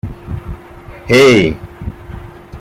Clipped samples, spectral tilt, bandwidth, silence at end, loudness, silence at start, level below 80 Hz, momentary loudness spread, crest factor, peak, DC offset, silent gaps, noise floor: under 0.1%; -5.5 dB/octave; 15.5 kHz; 0 s; -10 LUFS; 0.05 s; -34 dBFS; 25 LU; 14 dB; 0 dBFS; under 0.1%; none; -34 dBFS